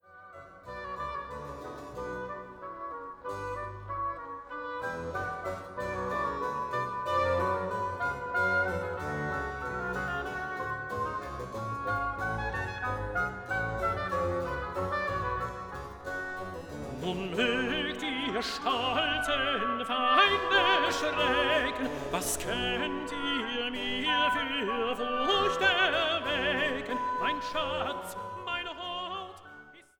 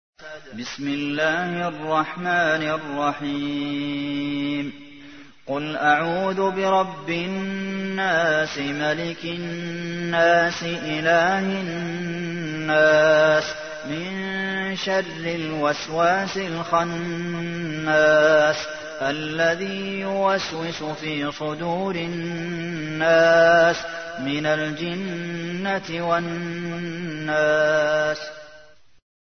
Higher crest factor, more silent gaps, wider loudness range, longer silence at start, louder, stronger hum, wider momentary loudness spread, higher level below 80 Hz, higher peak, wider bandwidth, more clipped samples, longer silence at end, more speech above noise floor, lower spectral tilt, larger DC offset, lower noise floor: about the same, 22 dB vs 18 dB; neither; first, 11 LU vs 5 LU; about the same, 0.1 s vs 0.2 s; second, -31 LUFS vs -22 LUFS; neither; about the same, 14 LU vs 12 LU; first, -52 dBFS vs -60 dBFS; second, -10 dBFS vs -6 dBFS; first, over 20 kHz vs 6.6 kHz; neither; second, 0.2 s vs 0.75 s; second, 22 dB vs 28 dB; second, -3.5 dB/octave vs -5 dB/octave; second, under 0.1% vs 0.3%; about the same, -52 dBFS vs -50 dBFS